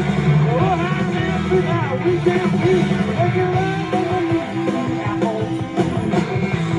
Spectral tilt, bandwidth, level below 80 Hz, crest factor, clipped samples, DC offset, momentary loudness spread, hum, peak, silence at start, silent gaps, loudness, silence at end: -7.5 dB/octave; 10.5 kHz; -42 dBFS; 14 dB; under 0.1%; under 0.1%; 4 LU; none; -4 dBFS; 0 s; none; -19 LUFS; 0 s